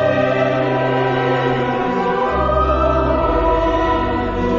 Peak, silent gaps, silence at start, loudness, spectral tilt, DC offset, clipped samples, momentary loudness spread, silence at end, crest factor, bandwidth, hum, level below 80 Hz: -2 dBFS; none; 0 s; -17 LUFS; -7.5 dB/octave; under 0.1%; under 0.1%; 2 LU; 0 s; 14 dB; 7.4 kHz; none; -28 dBFS